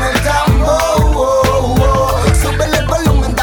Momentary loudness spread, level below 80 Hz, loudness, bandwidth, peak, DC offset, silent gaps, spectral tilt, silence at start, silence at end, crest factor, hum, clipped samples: 2 LU; -16 dBFS; -12 LUFS; 19 kHz; -2 dBFS; under 0.1%; none; -5.5 dB/octave; 0 s; 0 s; 10 dB; none; under 0.1%